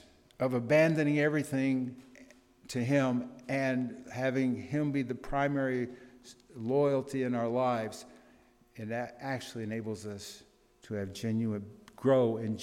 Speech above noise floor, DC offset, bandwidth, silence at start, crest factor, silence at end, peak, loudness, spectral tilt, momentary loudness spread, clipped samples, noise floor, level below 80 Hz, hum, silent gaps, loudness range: 31 dB; under 0.1%; 15 kHz; 0.4 s; 18 dB; 0 s; -14 dBFS; -32 LUFS; -7 dB/octave; 14 LU; under 0.1%; -62 dBFS; -60 dBFS; none; none; 8 LU